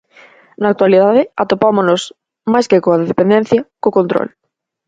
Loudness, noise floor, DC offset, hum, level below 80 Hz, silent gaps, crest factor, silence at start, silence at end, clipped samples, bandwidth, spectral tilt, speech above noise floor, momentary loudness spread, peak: -13 LUFS; -44 dBFS; under 0.1%; none; -56 dBFS; none; 14 dB; 0.6 s; 0.6 s; under 0.1%; 9.2 kHz; -6.5 dB/octave; 32 dB; 9 LU; 0 dBFS